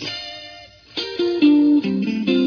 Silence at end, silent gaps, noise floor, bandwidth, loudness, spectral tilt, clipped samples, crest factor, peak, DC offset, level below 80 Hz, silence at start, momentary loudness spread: 0 s; none; -42 dBFS; 5.4 kHz; -18 LUFS; -6 dB/octave; under 0.1%; 14 dB; -4 dBFS; under 0.1%; -60 dBFS; 0 s; 18 LU